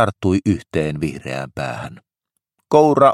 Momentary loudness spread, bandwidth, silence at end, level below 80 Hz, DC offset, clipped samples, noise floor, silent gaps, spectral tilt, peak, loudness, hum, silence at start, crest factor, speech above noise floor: 13 LU; 13 kHz; 0 s; -48 dBFS; under 0.1%; under 0.1%; -78 dBFS; none; -7 dB/octave; 0 dBFS; -19 LUFS; none; 0 s; 18 dB; 61 dB